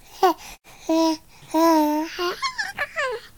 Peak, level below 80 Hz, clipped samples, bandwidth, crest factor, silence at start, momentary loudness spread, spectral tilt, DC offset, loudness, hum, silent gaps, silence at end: -6 dBFS; -56 dBFS; under 0.1%; 19 kHz; 16 dB; 0.15 s; 14 LU; -2.5 dB/octave; 0.2%; -23 LUFS; none; none; 0.1 s